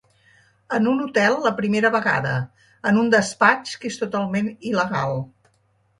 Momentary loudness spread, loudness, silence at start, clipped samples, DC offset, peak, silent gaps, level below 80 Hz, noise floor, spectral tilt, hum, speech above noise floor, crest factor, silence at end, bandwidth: 10 LU; -21 LUFS; 0.7 s; under 0.1%; under 0.1%; -2 dBFS; none; -62 dBFS; -64 dBFS; -5.5 dB/octave; none; 43 dB; 20 dB; 0.75 s; 11.5 kHz